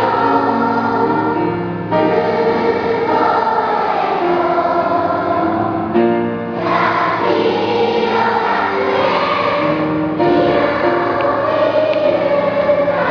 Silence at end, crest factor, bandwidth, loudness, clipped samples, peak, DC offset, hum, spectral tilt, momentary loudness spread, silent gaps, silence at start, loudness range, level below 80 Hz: 0 s; 14 dB; 5.4 kHz; -15 LUFS; under 0.1%; -2 dBFS; under 0.1%; none; -7.5 dB/octave; 3 LU; none; 0 s; 1 LU; -48 dBFS